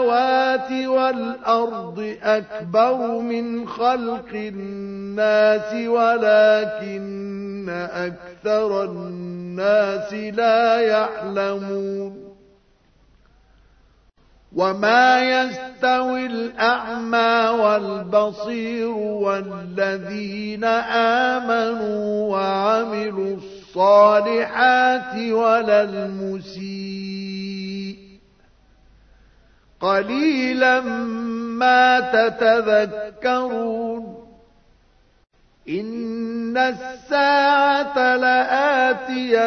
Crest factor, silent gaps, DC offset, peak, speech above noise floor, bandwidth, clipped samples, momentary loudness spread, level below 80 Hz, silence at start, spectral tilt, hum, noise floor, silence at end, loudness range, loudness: 18 dB; none; under 0.1%; -2 dBFS; 38 dB; 6.6 kHz; under 0.1%; 14 LU; -58 dBFS; 0 s; -5.5 dB/octave; none; -57 dBFS; 0 s; 9 LU; -20 LUFS